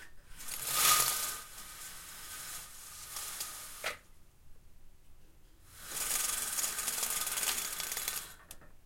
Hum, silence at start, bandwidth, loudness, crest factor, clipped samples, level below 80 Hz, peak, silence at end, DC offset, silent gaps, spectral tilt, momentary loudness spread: none; 0 s; 17 kHz; -33 LUFS; 26 dB; under 0.1%; -58 dBFS; -12 dBFS; 0.05 s; under 0.1%; none; 1 dB/octave; 19 LU